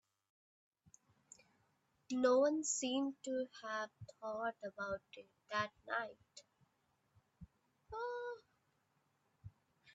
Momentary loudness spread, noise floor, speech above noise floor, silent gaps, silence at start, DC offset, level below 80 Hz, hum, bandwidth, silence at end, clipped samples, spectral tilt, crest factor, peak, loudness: 27 LU; -81 dBFS; 41 dB; none; 2.1 s; under 0.1%; -78 dBFS; none; 8.4 kHz; 0.05 s; under 0.1%; -3 dB/octave; 22 dB; -22 dBFS; -40 LUFS